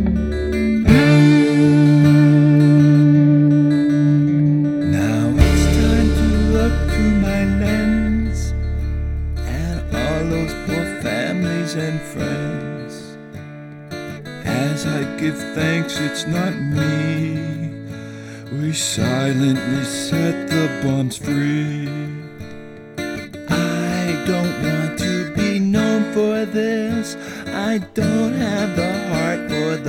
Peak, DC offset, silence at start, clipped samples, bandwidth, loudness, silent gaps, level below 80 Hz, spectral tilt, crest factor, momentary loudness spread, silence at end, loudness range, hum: 0 dBFS; under 0.1%; 0 s; under 0.1%; 15.5 kHz; -18 LUFS; none; -28 dBFS; -6.5 dB/octave; 18 dB; 17 LU; 0 s; 10 LU; none